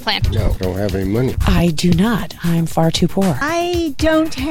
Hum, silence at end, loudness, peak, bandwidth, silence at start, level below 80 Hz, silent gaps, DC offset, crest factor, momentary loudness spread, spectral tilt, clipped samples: none; 0 s; -17 LUFS; -4 dBFS; 16.5 kHz; 0 s; -26 dBFS; none; under 0.1%; 12 dB; 5 LU; -6 dB/octave; under 0.1%